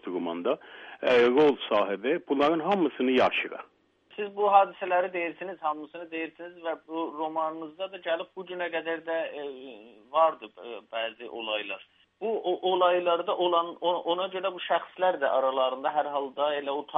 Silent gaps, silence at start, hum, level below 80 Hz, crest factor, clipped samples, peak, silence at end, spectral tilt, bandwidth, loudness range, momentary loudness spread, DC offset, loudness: none; 0.05 s; none; -74 dBFS; 22 dB; under 0.1%; -8 dBFS; 0 s; -6 dB/octave; 7.2 kHz; 8 LU; 14 LU; under 0.1%; -28 LUFS